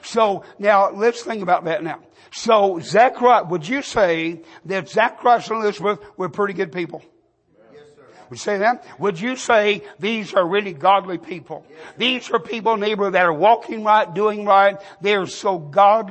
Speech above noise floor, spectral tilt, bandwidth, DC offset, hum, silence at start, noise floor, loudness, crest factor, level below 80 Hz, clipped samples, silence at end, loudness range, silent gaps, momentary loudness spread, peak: 38 dB; -4.5 dB/octave; 8.8 kHz; under 0.1%; none; 0 s; -57 dBFS; -19 LUFS; 16 dB; -62 dBFS; under 0.1%; 0 s; 6 LU; none; 13 LU; -2 dBFS